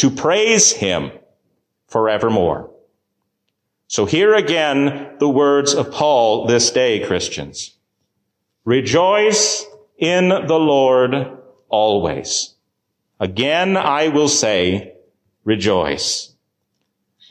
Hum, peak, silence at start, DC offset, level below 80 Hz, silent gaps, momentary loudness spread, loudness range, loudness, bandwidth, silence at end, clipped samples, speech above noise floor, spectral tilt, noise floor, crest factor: none; -2 dBFS; 0 s; under 0.1%; -48 dBFS; none; 11 LU; 3 LU; -16 LUFS; 12 kHz; 1.05 s; under 0.1%; 58 dB; -3 dB/octave; -73 dBFS; 16 dB